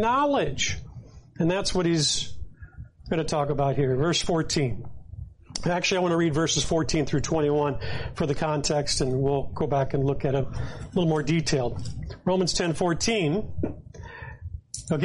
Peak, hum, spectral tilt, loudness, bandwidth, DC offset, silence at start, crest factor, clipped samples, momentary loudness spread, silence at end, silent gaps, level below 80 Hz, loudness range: -12 dBFS; none; -4.5 dB/octave; -26 LUFS; 11.5 kHz; under 0.1%; 0 s; 14 dB; under 0.1%; 17 LU; 0 s; none; -42 dBFS; 2 LU